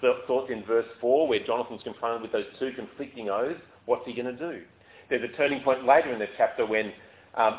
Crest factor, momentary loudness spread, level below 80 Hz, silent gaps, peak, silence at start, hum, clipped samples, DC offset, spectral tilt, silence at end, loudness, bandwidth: 20 dB; 14 LU; -66 dBFS; none; -6 dBFS; 0 s; none; under 0.1%; under 0.1%; -8.5 dB/octave; 0 s; -28 LUFS; 4 kHz